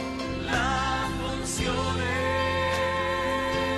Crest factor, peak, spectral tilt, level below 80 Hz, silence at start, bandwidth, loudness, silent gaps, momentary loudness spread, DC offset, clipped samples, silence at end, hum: 14 dB; -12 dBFS; -4 dB/octave; -40 dBFS; 0 s; 13 kHz; -27 LUFS; none; 4 LU; under 0.1%; under 0.1%; 0 s; none